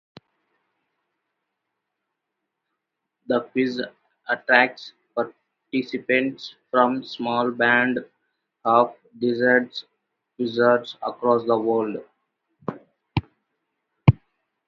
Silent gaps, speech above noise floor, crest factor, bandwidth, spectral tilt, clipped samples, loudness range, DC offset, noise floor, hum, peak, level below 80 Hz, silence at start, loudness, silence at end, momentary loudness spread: none; 59 dB; 24 dB; 6.6 kHz; -8 dB/octave; under 0.1%; 7 LU; under 0.1%; -81 dBFS; none; 0 dBFS; -52 dBFS; 3.3 s; -22 LUFS; 0.55 s; 16 LU